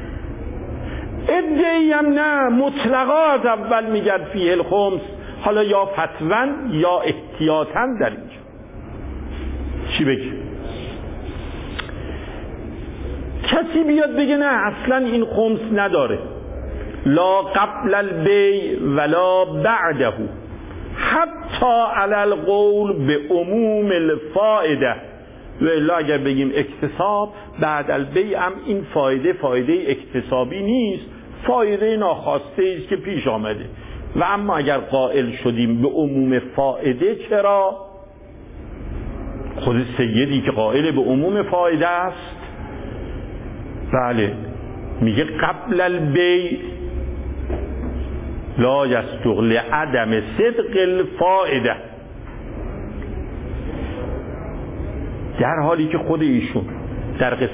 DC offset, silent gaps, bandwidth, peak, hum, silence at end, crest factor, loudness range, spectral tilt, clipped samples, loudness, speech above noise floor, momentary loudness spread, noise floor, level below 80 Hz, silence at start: under 0.1%; none; 4 kHz; -4 dBFS; none; 0 s; 16 dB; 6 LU; -10.5 dB/octave; under 0.1%; -19 LUFS; 22 dB; 15 LU; -40 dBFS; -36 dBFS; 0 s